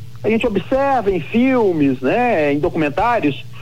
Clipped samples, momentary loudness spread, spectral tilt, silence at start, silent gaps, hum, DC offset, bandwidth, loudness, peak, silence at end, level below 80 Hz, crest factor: under 0.1%; 4 LU; -7.5 dB/octave; 0 s; none; none; 3%; 14.5 kHz; -17 LUFS; -6 dBFS; 0 s; -42 dBFS; 12 dB